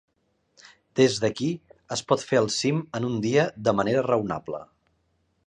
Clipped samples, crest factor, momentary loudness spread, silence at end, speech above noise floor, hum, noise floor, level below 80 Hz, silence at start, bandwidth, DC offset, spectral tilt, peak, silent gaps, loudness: under 0.1%; 20 dB; 10 LU; 0.8 s; 46 dB; none; -70 dBFS; -62 dBFS; 0.95 s; 11 kHz; under 0.1%; -5 dB/octave; -6 dBFS; none; -25 LUFS